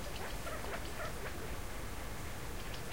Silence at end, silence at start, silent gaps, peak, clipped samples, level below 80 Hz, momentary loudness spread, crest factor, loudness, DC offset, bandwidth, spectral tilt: 0 s; 0 s; none; -28 dBFS; under 0.1%; -48 dBFS; 3 LU; 14 dB; -44 LUFS; 0.6%; 16 kHz; -4 dB/octave